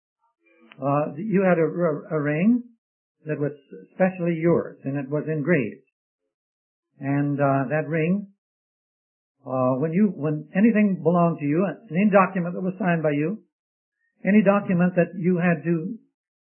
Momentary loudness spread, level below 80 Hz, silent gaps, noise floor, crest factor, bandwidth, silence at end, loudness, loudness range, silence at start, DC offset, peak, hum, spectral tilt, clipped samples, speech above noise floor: 10 LU; -70 dBFS; 2.78-3.15 s, 5.92-6.19 s, 6.34-6.83 s, 8.38-9.35 s, 13.52-13.92 s; under -90 dBFS; 20 dB; 3.1 kHz; 0.5 s; -23 LUFS; 5 LU; 0.8 s; under 0.1%; -2 dBFS; none; -13 dB/octave; under 0.1%; over 68 dB